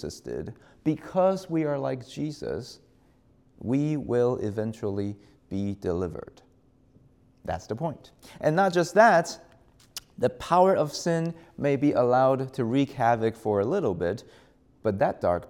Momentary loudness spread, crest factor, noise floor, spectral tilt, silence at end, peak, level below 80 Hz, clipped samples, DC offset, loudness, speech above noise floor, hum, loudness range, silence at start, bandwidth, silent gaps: 15 LU; 20 dB; -61 dBFS; -6.5 dB/octave; 0.05 s; -6 dBFS; -60 dBFS; under 0.1%; under 0.1%; -26 LUFS; 35 dB; none; 9 LU; 0 s; 17 kHz; none